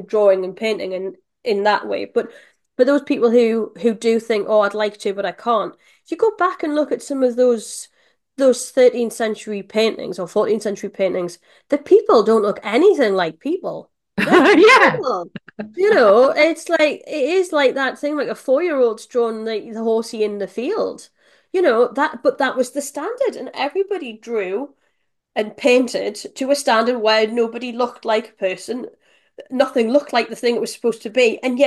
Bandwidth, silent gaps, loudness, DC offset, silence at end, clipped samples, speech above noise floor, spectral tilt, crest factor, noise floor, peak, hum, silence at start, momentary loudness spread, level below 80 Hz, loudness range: 12.5 kHz; none; -18 LUFS; under 0.1%; 0 s; under 0.1%; 52 dB; -4 dB/octave; 18 dB; -70 dBFS; 0 dBFS; none; 0 s; 12 LU; -68 dBFS; 7 LU